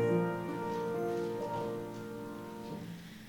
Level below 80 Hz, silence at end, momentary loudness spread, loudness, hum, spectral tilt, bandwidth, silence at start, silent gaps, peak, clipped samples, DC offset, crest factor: -68 dBFS; 0 s; 10 LU; -38 LUFS; none; -7.5 dB/octave; 19 kHz; 0 s; none; -20 dBFS; under 0.1%; under 0.1%; 16 dB